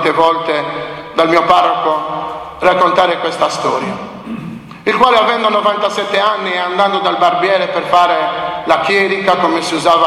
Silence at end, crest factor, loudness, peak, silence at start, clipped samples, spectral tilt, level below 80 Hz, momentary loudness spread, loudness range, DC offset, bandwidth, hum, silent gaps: 0 s; 14 dB; -13 LUFS; 0 dBFS; 0 s; under 0.1%; -4 dB/octave; -50 dBFS; 11 LU; 2 LU; under 0.1%; 13.5 kHz; none; none